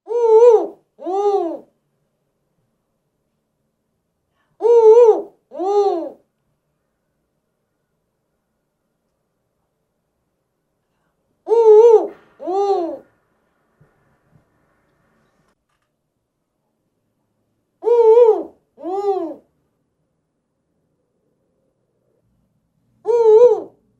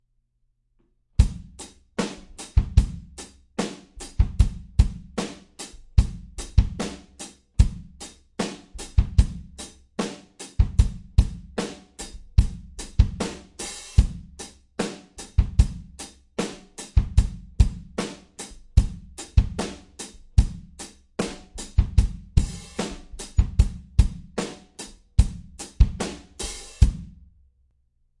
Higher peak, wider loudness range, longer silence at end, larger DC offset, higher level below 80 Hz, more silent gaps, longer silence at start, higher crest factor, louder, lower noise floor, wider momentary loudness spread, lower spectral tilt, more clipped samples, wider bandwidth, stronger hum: about the same, 0 dBFS vs -2 dBFS; first, 13 LU vs 2 LU; second, 0.35 s vs 1.1 s; neither; second, -74 dBFS vs -26 dBFS; neither; second, 0.1 s vs 1.2 s; about the same, 18 dB vs 22 dB; first, -14 LUFS vs -26 LUFS; about the same, -73 dBFS vs -70 dBFS; first, 21 LU vs 16 LU; about the same, -5 dB/octave vs -6 dB/octave; neither; second, 7.6 kHz vs 11.5 kHz; neither